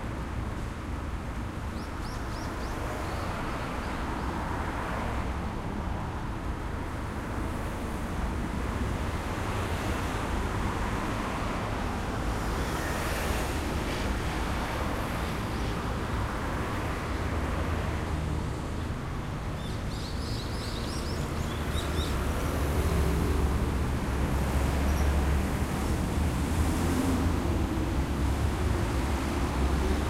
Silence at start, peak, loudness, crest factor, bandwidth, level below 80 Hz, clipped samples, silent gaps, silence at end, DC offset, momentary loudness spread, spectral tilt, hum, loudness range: 0 s; -14 dBFS; -31 LUFS; 16 dB; 16 kHz; -34 dBFS; under 0.1%; none; 0 s; under 0.1%; 7 LU; -6 dB/octave; none; 5 LU